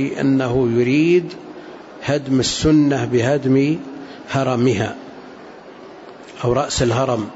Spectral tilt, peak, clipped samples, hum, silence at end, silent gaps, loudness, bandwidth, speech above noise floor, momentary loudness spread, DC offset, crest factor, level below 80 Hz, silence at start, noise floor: -6 dB/octave; -4 dBFS; under 0.1%; none; 0 s; none; -18 LUFS; 8 kHz; 22 dB; 23 LU; under 0.1%; 14 dB; -42 dBFS; 0 s; -38 dBFS